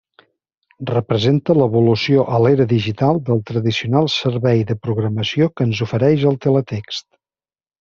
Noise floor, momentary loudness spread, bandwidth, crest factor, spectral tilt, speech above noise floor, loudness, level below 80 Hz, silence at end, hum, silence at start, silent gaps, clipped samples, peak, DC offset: under -90 dBFS; 7 LU; 7.2 kHz; 16 dB; -7.5 dB/octave; over 74 dB; -17 LUFS; -54 dBFS; 0.8 s; none; 0.8 s; none; under 0.1%; -2 dBFS; under 0.1%